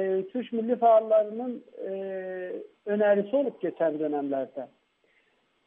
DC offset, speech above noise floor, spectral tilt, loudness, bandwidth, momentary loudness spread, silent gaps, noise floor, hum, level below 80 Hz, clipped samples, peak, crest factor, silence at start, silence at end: under 0.1%; 42 dB; -9.5 dB/octave; -27 LUFS; 3.7 kHz; 16 LU; none; -69 dBFS; none; -84 dBFS; under 0.1%; -12 dBFS; 16 dB; 0 s; 1 s